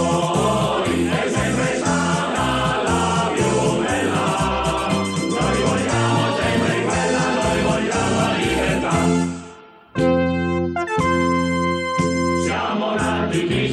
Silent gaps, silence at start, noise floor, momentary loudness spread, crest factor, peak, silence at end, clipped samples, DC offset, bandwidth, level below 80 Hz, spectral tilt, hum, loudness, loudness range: none; 0 s; -42 dBFS; 3 LU; 14 dB; -6 dBFS; 0 s; under 0.1%; under 0.1%; 12.5 kHz; -38 dBFS; -5 dB/octave; none; -19 LUFS; 1 LU